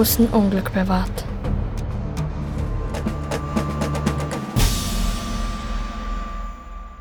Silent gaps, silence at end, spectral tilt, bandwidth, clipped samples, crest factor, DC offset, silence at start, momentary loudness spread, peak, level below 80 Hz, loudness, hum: none; 0 s; -5.5 dB/octave; over 20 kHz; under 0.1%; 16 dB; under 0.1%; 0 s; 11 LU; -6 dBFS; -28 dBFS; -24 LUFS; none